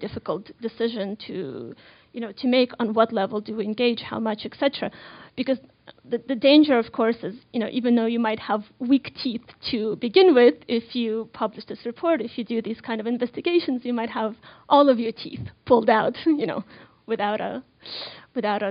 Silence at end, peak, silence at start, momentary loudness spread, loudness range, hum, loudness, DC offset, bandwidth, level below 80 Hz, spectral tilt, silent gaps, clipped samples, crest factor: 0 s; -4 dBFS; 0 s; 17 LU; 5 LU; none; -23 LUFS; under 0.1%; 5.4 kHz; -62 dBFS; -3 dB/octave; none; under 0.1%; 20 dB